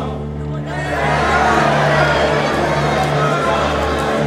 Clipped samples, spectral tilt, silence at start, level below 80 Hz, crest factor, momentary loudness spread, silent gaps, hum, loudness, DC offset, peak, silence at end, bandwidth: under 0.1%; -5.5 dB/octave; 0 s; -30 dBFS; 14 dB; 10 LU; none; none; -16 LUFS; under 0.1%; -2 dBFS; 0 s; 14 kHz